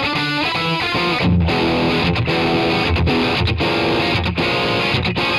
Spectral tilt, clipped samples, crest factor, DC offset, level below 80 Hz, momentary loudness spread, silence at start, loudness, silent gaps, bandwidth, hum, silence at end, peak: -6 dB/octave; under 0.1%; 12 dB; under 0.1%; -32 dBFS; 2 LU; 0 s; -17 LUFS; none; 13.5 kHz; none; 0 s; -6 dBFS